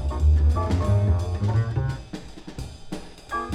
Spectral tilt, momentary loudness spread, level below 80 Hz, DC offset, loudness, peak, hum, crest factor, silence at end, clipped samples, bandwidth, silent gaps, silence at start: -7.5 dB/octave; 18 LU; -26 dBFS; under 0.1%; -23 LUFS; -10 dBFS; none; 14 dB; 0 s; under 0.1%; 10 kHz; none; 0 s